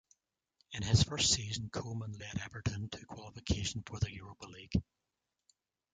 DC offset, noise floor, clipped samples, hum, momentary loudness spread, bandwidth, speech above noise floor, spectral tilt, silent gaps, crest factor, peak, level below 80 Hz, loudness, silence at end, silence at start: under 0.1%; -77 dBFS; under 0.1%; none; 17 LU; 9.6 kHz; 41 dB; -3.5 dB/octave; none; 22 dB; -14 dBFS; -48 dBFS; -35 LUFS; 1.1 s; 0.7 s